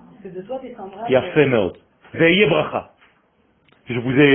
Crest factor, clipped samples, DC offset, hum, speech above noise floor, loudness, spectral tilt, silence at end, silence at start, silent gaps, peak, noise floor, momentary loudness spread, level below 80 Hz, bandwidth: 20 dB; under 0.1%; under 0.1%; none; 43 dB; -18 LUFS; -11 dB/octave; 0 s; 0.25 s; none; 0 dBFS; -60 dBFS; 20 LU; -52 dBFS; 3.5 kHz